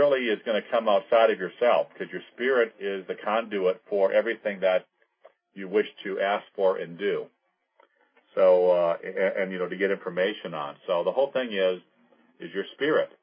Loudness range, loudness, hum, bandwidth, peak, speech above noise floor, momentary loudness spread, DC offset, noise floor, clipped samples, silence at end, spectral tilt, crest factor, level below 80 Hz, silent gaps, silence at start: 3 LU; -26 LUFS; none; 5.2 kHz; -8 dBFS; 41 dB; 13 LU; under 0.1%; -66 dBFS; under 0.1%; 0.15 s; -9 dB/octave; 18 dB; -88 dBFS; none; 0 s